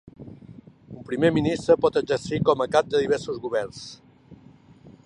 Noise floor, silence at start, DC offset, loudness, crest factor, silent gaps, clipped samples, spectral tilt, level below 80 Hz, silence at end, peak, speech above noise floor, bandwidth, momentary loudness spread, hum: -51 dBFS; 0.2 s; under 0.1%; -23 LUFS; 18 dB; none; under 0.1%; -6 dB/octave; -54 dBFS; 0.15 s; -6 dBFS; 28 dB; 10 kHz; 23 LU; none